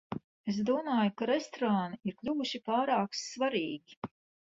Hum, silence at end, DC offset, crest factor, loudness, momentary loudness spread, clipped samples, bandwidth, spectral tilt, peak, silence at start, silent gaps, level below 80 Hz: none; 0.35 s; under 0.1%; 16 dB; -33 LUFS; 13 LU; under 0.1%; 8 kHz; -5 dB/octave; -16 dBFS; 0.1 s; 0.24-0.44 s, 3.97-4.02 s; -72 dBFS